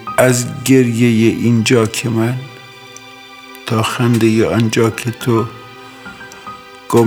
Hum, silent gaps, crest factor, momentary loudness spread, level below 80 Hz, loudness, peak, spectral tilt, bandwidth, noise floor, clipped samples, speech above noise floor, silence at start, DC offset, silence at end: none; none; 14 dB; 22 LU; -52 dBFS; -14 LUFS; 0 dBFS; -5.5 dB/octave; 18.5 kHz; -36 dBFS; under 0.1%; 23 dB; 0 s; under 0.1%; 0 s